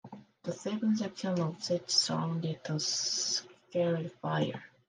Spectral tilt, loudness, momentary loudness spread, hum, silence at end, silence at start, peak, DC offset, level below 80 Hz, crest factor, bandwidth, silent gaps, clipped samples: -4 dB/octave; -32 LUFS; 10 LU; none; 0.2 s; 0.05 s; -14 dBFS; under 0.1%; -78 dBFS; 20 dB; 11 kHz; none; under 0.1%